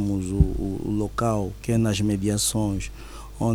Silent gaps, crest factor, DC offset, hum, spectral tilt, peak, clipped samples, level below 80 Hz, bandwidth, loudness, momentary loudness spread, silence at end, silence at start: none; 20 dB; under 0.1%; none; -5.5 dB/octave; -4 dBFS; under 0.1%; -34 dBFS; over 20 kHz; -25 LUFS; 9 LU; 0 s; 0 s